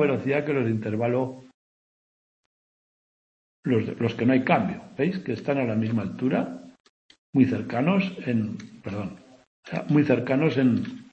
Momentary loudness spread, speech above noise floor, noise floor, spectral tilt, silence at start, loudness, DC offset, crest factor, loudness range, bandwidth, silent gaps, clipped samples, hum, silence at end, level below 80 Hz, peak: 12 LU; over 66 dB; under -90 dBFS; -8.5 dB/octave; 0 s; -25 LUFS; under 0.1%; 20 dB; 6 LU; 7.8 kHz; 1.54-3.63 s, 6.80-7.09 s, 7.18-7.33 s, 9.47-9.63 s; under 0.1%; none; 0.1 s; -66 dBFS; -6 dBFS